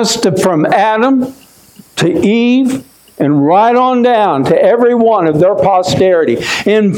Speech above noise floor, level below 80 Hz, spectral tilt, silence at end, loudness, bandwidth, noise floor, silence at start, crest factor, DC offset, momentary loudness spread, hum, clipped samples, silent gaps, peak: 31 dB; -50 dBFS; -5.5 dB/octave; 0 s; -10 LUFS; 16.5 kHz; -41 dBFS; 0 s; 10 dB; under 0.1%; 6 LU; none; under 0.1%; none; 0 dBFS